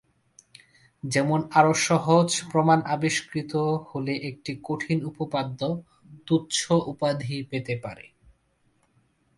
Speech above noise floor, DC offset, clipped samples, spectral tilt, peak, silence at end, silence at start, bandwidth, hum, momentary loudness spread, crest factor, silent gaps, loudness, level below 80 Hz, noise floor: 43 dB; under 0.1%; under 0.1%; -5 dB/octave; -4 dBFS; 1.35 s; 1.05 s; 11.5 kHz; none; 12 LU; 24 dB; none; -25 LUFS; -62 dBFS; -68 dBFS